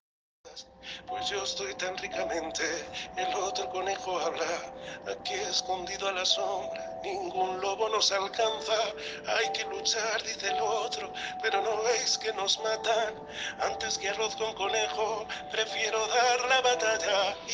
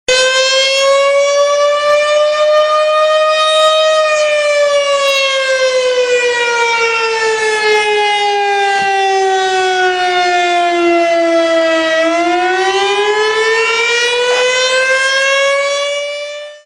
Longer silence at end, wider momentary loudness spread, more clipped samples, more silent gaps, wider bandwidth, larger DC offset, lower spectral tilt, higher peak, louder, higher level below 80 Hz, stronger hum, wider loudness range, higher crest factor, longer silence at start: about the same, 0 s vs 0.05 s; first, 10 LU vs 3 LU; neither; neither; about the same, 10.5 kHz vs 10.5 kHz; neither; about the same, -0.5 dB/octave vs -0.5 dB/octave; second, -12 dBFS vs -2 dBFS; second, -30 LUFS vs -11 LUFS; second, -64 dBFS vs -56 dBFS; neither; first, 5 LU vs 2 LU; first, 20 dB vs 10 dB; first, 0.45 s vs 0.1 s